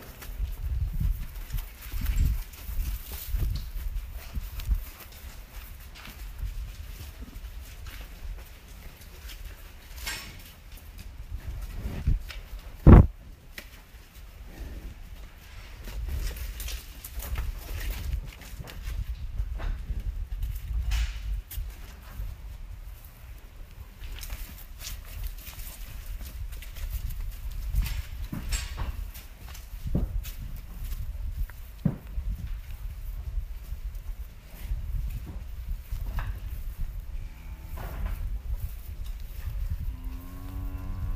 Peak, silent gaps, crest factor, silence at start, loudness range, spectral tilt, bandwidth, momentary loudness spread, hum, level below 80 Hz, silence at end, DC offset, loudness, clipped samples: -2 dBFS; none; 28 dB; 0 s; 18 LU; -6.5 dB/octave; 15.5 kHz; 13 LU; none; -32 dBFS; 0 s; under 0.1%; -33 LUFS; under 0.1%